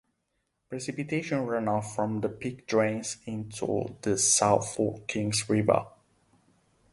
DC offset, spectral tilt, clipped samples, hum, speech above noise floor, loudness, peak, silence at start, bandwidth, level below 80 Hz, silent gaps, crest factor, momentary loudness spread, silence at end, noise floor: under 0.1%; -4 dB/octave; under 0.1%; none; 50 dB; -28 LUFS; -8 dBFS; 0.7 s; 11.5 kHz; -62 dBFS; none; 22 dB; 14 LU; 1.05 s; -78 dBFS